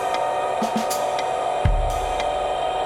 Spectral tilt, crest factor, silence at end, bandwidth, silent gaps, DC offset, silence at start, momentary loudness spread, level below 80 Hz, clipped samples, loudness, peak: -4.5 dB/octave; 16 dB; 0 s; 16.5 kHz; none; under 0.1%; 0 s; 1 LU; -30 dBFS; under 0.1%; -23 LUFS; -6 dBFS